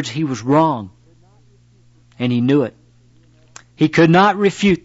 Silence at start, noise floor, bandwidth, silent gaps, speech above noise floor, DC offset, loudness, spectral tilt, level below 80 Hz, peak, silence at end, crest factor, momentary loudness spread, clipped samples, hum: 0 s; -51 dBFS; 8 kHz; none; 36 dB; under 0.1%; -16 LUFS; -6.5 dB/octave; -52 dBFS; -4 dBFS; 0.05 s; 14 dB; 13 LU; under 0.1%; 60 Hz at -40 dBFS